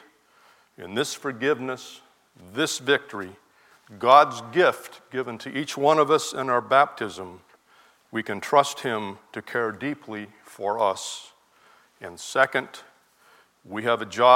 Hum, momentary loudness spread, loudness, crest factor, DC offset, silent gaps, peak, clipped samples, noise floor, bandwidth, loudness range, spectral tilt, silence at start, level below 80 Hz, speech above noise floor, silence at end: none; 19 LU; -24 LUFS; 24 dB; under 0.1%; none; -2 dBFS; under 0.1%; -58 dBFS; 16.5 kHz; 7 LU; -3.5 dB/octave; 0.8 s; -76 dBFS; 34 dB; 0 s